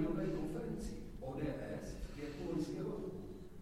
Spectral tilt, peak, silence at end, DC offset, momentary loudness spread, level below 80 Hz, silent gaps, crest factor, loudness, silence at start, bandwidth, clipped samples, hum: -7 dB/octave; -26 dBFS; 0 s; under 0.1%; 8 LU; -52 dBFS; none; 16 dB; -44 LUFS; 0 s; 16 kHz; under 0.1%; none